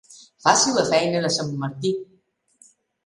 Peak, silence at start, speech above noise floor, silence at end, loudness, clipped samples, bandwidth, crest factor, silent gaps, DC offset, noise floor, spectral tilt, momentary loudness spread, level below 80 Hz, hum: -2 dBFS; 0.1 s; 37 dB; 1 s; -21 LUFS; under 0.1%; 11.5 kHz; 22 dB; none; under 0.1%; -58 dBFS; -3 dB/octave; 10 LU; -64 dBFS; none